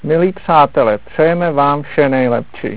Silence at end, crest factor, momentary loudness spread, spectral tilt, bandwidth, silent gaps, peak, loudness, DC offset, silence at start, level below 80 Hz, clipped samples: 0 s; 14 dB; 4 LU; -10.5 dB/octave; 4 kHz; none; 0 dBFS; -13 LUFS; 2%; 0.05 s; -46 dBFS; 0.2%